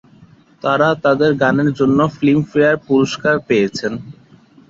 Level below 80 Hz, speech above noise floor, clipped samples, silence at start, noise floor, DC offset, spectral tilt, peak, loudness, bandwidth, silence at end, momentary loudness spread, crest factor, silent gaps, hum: -52 dBFS; 32 dB; under 0.1%; 0.65 s; -47 dBFS; under 0.1%; -6.5 dB/octave; -2 dBFS; -15 LUFS; 7.8 kHz; 0.6 s; 7 LU; 14 dB; none; none